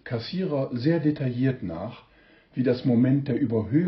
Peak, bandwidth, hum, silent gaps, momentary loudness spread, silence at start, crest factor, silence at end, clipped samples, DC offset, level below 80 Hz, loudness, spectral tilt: -10 dBFS; 5.8 kHz; none; none; 12 LU; 0.05 s; 14 dB; 0 s; under 0.1%; under 0.1%; -60 dBFS; -25 LUFS; -8 dB/octave